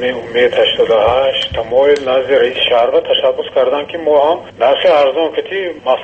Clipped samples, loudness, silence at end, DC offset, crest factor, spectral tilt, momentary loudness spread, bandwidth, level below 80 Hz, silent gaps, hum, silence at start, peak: under 0.1%; -13 LUFS; 0 s; under 0.1%; 12 dB; -4.5 dB/octave; 6 LU; 8.4 kHz; -44 dBFS; none; none; 0 s; 0 dBFS